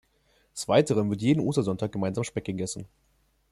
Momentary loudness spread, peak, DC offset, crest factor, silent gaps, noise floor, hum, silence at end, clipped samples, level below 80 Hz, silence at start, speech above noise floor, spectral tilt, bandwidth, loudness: 13 LU; -8 dBFS; under 0.1%; 20 dB; none; -67 dBFS; none; 0.65 s; under 0.1%; -60 dBFS; 0.55 s; 40 dB; -6 dB/octave; 13 kHz; -27 LUFS